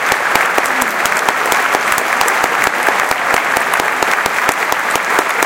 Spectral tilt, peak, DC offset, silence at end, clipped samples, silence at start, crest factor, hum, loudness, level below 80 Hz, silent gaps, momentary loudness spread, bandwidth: -1 dB/octave; 0 dBFS; under 0.1%; 0 s; 0.1%; 0 s; 14 dB; none; -13 LUFS; -48 dBFS; none; 2 LU; over 20 kHz